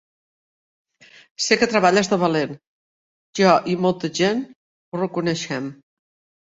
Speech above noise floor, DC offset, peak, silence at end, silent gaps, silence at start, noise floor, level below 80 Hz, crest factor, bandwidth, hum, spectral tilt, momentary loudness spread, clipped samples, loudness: over 70 dB; under 0.1%; -2 dBFS; 0.7 s; 2.67-3.33 s, 4.56-4.92 s; 1.4 s; under -90 dBFS; -62 dBFS; 20 dB; 8.2 kHz; none; -4.5 dB/octave; 16 LU; under 0.1%; -20 LUFS